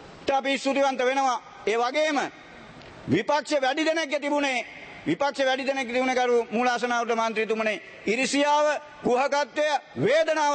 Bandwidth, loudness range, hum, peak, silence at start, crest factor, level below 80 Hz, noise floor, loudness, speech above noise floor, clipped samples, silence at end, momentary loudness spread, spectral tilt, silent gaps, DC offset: 8.8 kHz; 2 LU; none; -12 dBFS; 0 s; 14 dB; -66 dBFS; -45 dBFS; -25 LUFS; 21 dB; under 0.1%; 0 s; 7 LU; -3.5 dB/octave; none; under 0.1%